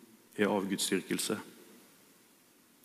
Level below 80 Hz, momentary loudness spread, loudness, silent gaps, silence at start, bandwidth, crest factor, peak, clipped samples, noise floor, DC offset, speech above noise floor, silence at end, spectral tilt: -86 dBFS; 13 LU; -33 LUFS; none; 0 s; 15.5 kHz; 22 dB; -16 dBFS; under 0.1%; -64 dBFS; under 0.1%; 31 dB; 1.1 s; -3.5 dB/octave